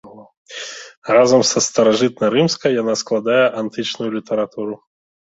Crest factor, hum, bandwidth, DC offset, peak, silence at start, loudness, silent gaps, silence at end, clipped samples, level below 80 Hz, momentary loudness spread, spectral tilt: 16 dB; none; 8 kHz; under 0.1%; -2 dBFS; 0.05 s; -17 LUFS; 0.37-0.46 s, 0.97-1.02 s; 0.65 s; under 0.1%; -60 dBFS; 17 LU; -3.5 dB/octave